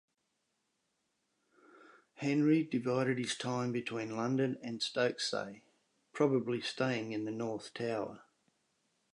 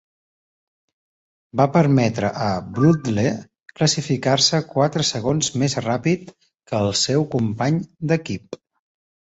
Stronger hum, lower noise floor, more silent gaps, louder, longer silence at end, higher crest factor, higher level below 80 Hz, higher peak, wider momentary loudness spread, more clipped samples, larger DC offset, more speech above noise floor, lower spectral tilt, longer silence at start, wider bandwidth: neither; second, -82 dBFS vs under -90 dBFS; second, none vs 3.60-3.64 s; second, -35 LUFS vs -20 LUFS; first, 0.95 s vs 0.8 s; about the same, 20 dB vs 18 dB; second, -82 dBFS vs -52 dBFS; second, -16 dBFS vs -2 dBFS; about the same, 9 LU vs 9 LU; neither; neither; second, 48 dB vs over 70 dB; about the same, -5.5 dB/octave vs -5 dB/octave; first, 2.2 s vs 1.55 s; first, 11 kHz vs 8.2 kHz